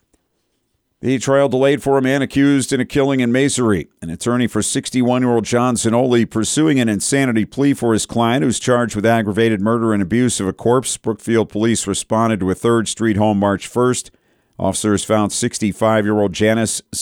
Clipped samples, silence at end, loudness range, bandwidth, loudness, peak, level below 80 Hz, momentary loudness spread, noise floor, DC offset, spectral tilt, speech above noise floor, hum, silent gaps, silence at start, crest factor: under 0.1%; 0 s; 2 LU; 17 kHz; -17 LUFS; -4 dBFS; -48 dBFS; 4 LU; -68 dBFS; under 0.1%; -5 dB/octave; 52 dB; none; none; 1.05 s; 14 dB